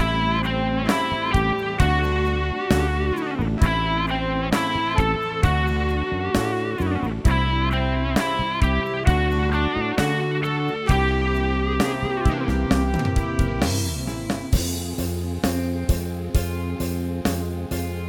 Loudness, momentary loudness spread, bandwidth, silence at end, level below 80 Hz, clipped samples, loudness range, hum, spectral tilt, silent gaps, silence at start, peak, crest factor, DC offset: -23 LUFS; 5 LU; 19 kHz; 0 s; -28 dBFS; under 0.1%; 3 LU; none; -5.5 dB/octave; none; 0 s; -4 dBFS; 18 dB; under 0.1%